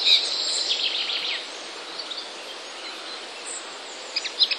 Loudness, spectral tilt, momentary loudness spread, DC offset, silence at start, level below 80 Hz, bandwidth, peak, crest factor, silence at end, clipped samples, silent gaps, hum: -26 LUFS; 2.5 dB/octave; 13 LU; under 0.1%; 0 s; -84 dBFS; 12.5 kHz; -6 dBFS; 22 dB; 0 s; under 0.1%; none; none